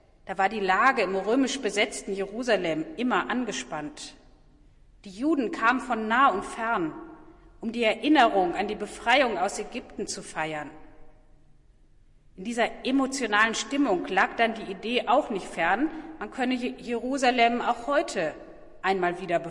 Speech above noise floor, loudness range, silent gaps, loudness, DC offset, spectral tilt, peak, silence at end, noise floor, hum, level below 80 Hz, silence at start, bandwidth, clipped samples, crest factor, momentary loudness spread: 30 dB; 5 LU; none; -26 LUFS; under 0.1%; -3.5 dB/octave; -8 dBFS; 0 s; -56 dBFS; none; -56 dBFS; 0.25 s; 11.5 kHz; under 0.1%; 20 dB; 13 LU